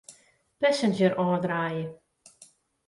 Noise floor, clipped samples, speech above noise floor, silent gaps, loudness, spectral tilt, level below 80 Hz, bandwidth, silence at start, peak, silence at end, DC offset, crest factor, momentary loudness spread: -60 dBFS; under 0.1%; 34 dB; none; -26 LUFS; -6 dB/octave; -70 dBFS; 11.5 kHz; 0.1 s; -10 dBFS; 0.95 s; under 0.1%; 18 dB; 9 LU